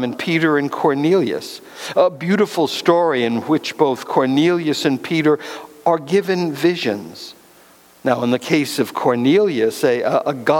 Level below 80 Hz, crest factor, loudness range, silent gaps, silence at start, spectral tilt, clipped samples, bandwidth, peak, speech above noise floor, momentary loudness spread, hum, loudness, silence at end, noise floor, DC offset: -66 dBFS; 16 dB; 3 LU; none; 0 s; -5.5 dB/octave; under 0.1%; 18 kHz; 0 dBFS; 31 dB; 8 LU; none; -18 LUFS; 0 s; -48 dBFS; under 0.1%